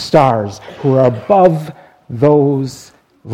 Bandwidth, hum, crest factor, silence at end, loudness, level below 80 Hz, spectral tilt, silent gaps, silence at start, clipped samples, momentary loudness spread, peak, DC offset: 13.5 kHz; none; 14 dB; 0 s; -13 LUFS; -50 dBFS; -7.5 dB/octave; none; 0 s; 0.1%; 15 LU; 0 dBFS; under 0.1%